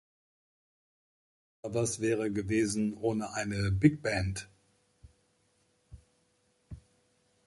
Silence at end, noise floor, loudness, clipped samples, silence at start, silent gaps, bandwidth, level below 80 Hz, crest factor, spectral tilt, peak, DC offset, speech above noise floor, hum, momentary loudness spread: 0.7 s; -72 dBFS; -31 LUFS; under 0.1%; 1.65 s; none; 11.5 kHz; -52 dBFS; 26 dB; -5.5 dB/octave; -10 dBFS; under 0.1%; 42 dB; none; 25 LU